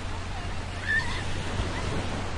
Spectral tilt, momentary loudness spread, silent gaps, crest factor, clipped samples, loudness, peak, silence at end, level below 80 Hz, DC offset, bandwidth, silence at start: -4.5 dB/octave; 8 LU; none; 14 dB; under 0.1%; -31 LUFS; -14 dBFS; 0 s; -36 dBFS; under 0.1%; 11.5 kHz; 0 s